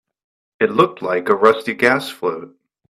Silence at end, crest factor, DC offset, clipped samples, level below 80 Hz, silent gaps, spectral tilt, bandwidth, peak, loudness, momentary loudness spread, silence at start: 0.4 s; 18 dB; under 0.1%; under 0.1%; -62 dBFS; none; -5.5 dB/octave; 14 kHz; 0 dBFS; -17 LUFS; 10 LU; 0.6 s